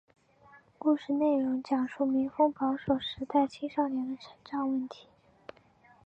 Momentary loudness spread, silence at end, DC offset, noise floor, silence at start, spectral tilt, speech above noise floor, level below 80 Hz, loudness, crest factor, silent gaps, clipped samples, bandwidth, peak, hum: 10 LU; 1.1 s; under 0.1%; -61 dBFS; 0.8 s; -6.5 dB/octave; 32 dB; -68 dBFS; -30 LUFS; 18 dB; none; under 0.1%; 8 kHz; -14 dBFS; none